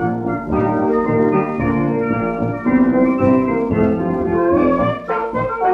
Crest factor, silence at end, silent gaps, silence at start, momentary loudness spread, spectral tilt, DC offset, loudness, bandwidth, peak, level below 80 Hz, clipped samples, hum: 14 dB; 0 s; none; 0 s; 6 LU; -10 dB/octave; under 0.1%; -17 LUFS; 5 kHz; -2 dBFS; -40 dBFS; under 0.1%; none